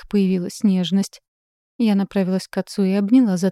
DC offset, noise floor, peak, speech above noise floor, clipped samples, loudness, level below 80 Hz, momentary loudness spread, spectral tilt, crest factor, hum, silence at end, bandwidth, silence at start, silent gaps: under 0.1%; under -90 dBFS; -6 dBFS; over 72 dB; under 0.1%; -20 LUFS; -56 dBFS; 7 LU; -7 dB/octave; 14 dB; none; 0 s; 13 kHz; 0.05 s; 1.28-1.79 s